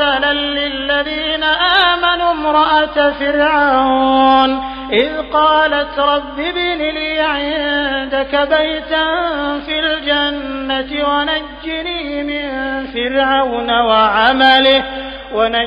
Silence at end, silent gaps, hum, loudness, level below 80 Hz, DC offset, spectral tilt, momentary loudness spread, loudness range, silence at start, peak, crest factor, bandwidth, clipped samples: 0 s; none; none; -14 LUFS; -38 dBFS; under 0.1%; 0.5 dB/octave; 10 LU; 5 LU; 0 s; 0 dBFS; 14 dB; 5.4 kHz; under 0.1%